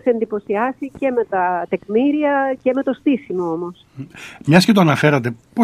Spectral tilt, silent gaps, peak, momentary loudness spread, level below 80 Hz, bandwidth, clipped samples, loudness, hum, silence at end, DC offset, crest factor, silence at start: -6.5 dB/octave; none; 0 dBFS; 14 LU; -58 dBFS; 15.5 kHz; under 0.1%; -18 LUFS; none; 0 s; under 0.1%; 18 dB; 0.05 s